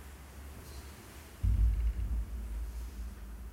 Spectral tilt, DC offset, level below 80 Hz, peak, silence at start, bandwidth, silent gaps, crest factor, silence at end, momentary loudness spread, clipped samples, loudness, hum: -6.5 dB/octave; under 0.1%; -36 dBFS; -20 dBFS; 0 s; 15.5 kHz; none; 16 dB; 0 s; 18 LU; under 0.1%; -37 LUFS; none